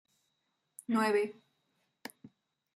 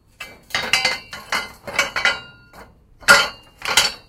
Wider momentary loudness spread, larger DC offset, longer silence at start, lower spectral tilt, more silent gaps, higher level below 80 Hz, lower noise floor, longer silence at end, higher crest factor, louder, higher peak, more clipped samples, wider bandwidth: first, 21 LU vs 16 LU; neither; first, 0.9 s vs 0.2 s; first, -5 dB/octave vs 0 dB/octave; neither; second, -86 dBFS vs -50 dBFS; first, -81 dBFS vs -45 dBFS; first, 0.5 s vs 0.1 s; about the same, 20 dB vs 22 dB; second, -32 LUFS vs -18 LUFS; second, -18 dBFS vs 0 dBFS; neither; second, 15 kHz vs 17 kHz